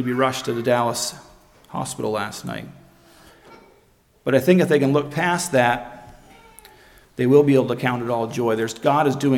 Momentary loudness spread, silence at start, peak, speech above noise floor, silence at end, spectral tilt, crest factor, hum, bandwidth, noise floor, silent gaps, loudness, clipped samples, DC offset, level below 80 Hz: 14 LU; 0 s; -2 dBFS; 38 dB; 0 s; -5.5 dB/octave; 18 dB; none; 17.5 kHz; -57 dBFS; none; -20 LUFS; under 0.1%; under 0.1%; -56 dBFS